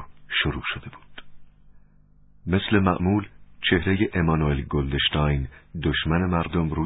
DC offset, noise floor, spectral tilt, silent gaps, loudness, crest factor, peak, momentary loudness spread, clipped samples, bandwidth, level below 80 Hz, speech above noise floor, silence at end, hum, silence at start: under 0.1%; -54 dBFS; -11 dB/octave; none; -24 LUFS; 20 dB; -4 dBFS; 9 LU; under 0.1%; 4 kHz; -36 dBFS; 30 dB; 0 s; 50 Hz at -45 dBFS; 0 s